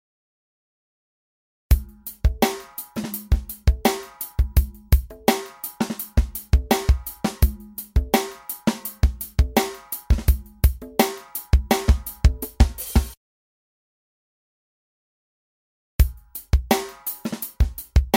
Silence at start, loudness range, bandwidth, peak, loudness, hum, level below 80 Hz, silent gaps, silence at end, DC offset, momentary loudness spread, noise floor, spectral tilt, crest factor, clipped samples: 1.7 s; 6 LU; 17 kHz; -2 dBFS; -24 LUFS; none; -24 dBFS; 13.17-15.99 s; 0 s; under 0.1%; 9 LU; under -90 dBFS; -5.5 dB/octave; 22 dB; under 0.1%